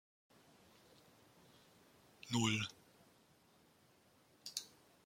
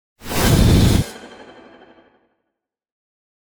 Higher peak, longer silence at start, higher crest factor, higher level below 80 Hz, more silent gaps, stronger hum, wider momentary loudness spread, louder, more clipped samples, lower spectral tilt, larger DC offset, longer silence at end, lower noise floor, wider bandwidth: second, -22 dBFS vs -4 dBFS; first, 2.25 s vs 0.25 s; first, 26 dB vs 16 dB; second, -80 dBFS vs -26 dBFS; neither; neither; first, 29 LU vs 16 LU; second, -41 LUFS vs -16 LUFS; neither; second, -3.5 dB/octave vs -5.5 dB/octave; neither; second, 0.4 s vs 2.2 s; second, -71 dBFS vs -79 dBFS; second, 16.5 kHz vs over 20 kHz